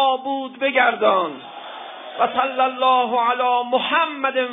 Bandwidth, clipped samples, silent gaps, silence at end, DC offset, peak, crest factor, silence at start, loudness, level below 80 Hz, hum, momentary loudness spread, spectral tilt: 3.9 kHz; under 0.1%; none; 0 s; under 0.1%; -2 dBFS; 18 dB; 0 s; -19 LUFS; -78 dBFS; none; 17 LU; -6 dB/octave